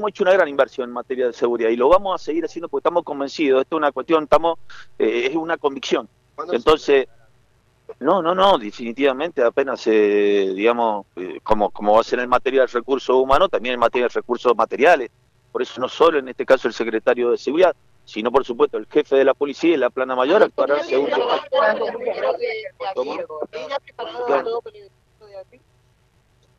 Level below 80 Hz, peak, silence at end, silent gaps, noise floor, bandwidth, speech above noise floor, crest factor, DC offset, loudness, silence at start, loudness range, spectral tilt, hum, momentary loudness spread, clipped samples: -50 dBFS; -4 dBFS; 1.15 s; none; -59 dBFS; 9 kHz; 40 dB; 16 dB; under 0.1%; -19 LUFS; 0 s; 5 LU; -5 dB/octave; none; 11 LU; under 0.1%